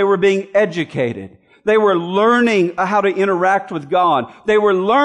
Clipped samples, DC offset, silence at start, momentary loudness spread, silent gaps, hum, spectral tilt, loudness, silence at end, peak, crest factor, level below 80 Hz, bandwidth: under 0.1%; under 0.1%; 0 s; 7 LU; none; none; -6 dB/octave; -16 LUFS; 0 s; -4 dBFS; 12 dB; -58 dBFS; 10 kHz